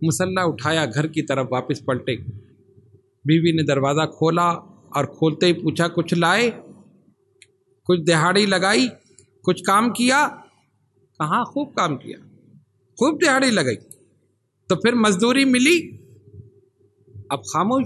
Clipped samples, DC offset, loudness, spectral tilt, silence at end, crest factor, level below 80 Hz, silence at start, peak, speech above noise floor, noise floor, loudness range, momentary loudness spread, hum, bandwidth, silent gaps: under 0.1%; under 0.1%; -20 LUFS; -4.5 dB/octave; 0 s; 18 dB; -60 dBFS; 0 s; -2 dBFS; 47 dB; -66 dBFS; 4 LU; 11 LU; none; 12.5 kHz; none